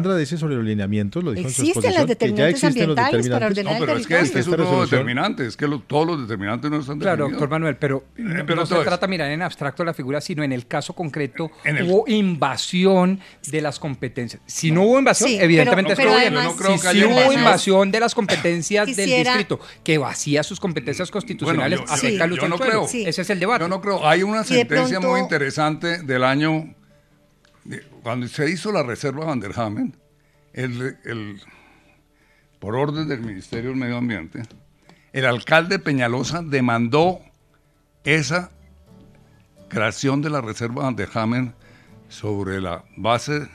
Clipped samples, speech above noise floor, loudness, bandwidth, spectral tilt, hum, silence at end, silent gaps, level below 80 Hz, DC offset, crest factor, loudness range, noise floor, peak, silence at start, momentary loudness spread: under 0.1%; 39 dB; -20 LUFS; 14.5 kHz; -5 dB/octave; none; 0.05 s; none; -56 dBFS; under 0.1%; 20 dB; 10 LU; -59 dBFS; 0 dBFS; 0 s; 12 LU